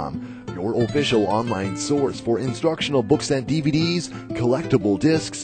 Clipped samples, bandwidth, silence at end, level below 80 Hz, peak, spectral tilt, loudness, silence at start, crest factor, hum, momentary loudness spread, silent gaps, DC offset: under 0.1%; 9.2 kHz; 0 s; -50 dBFS; -4 dBFS; -5.5 dB/octave; -22 LUFS; 0 s; 16 dB; none; 7 LU; none; under 0.1%